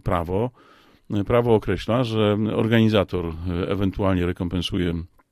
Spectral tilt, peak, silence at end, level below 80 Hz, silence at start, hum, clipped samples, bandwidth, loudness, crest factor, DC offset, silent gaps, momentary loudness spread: -7.5 dB/octave; -4 dBFS; 0.25 s; -40 dBFS; 0.05 s; none; under 0.1%; 14 kHz; -23 LUFS; 18 dB; under 0.1%; none; 9 LU